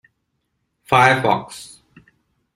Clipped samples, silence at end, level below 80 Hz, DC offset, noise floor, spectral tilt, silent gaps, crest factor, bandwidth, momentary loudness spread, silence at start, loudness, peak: under 0.1%; 0.9 s; -56 dBFS; under 0.1%; -72 dBFS; -4.5 dB/octave; none; 20 dB; 16 kHz; 22 LU; 0.9 s; -16 LUFS; -2 dBFS